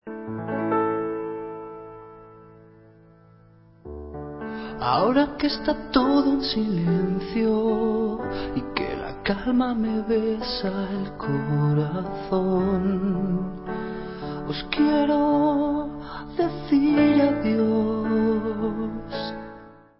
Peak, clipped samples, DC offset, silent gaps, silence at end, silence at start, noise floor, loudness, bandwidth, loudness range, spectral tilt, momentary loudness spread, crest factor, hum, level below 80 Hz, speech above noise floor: -6 dBFS; under 0.1%; under 0.1%; none; 0.25 s; 0.05 s; -53 dBFS; -24 LUFS; 5.8 kHz; 8 LU; -11 dB/octave; 13 LU; 18 dB; none; -48 dBFS; 30 dB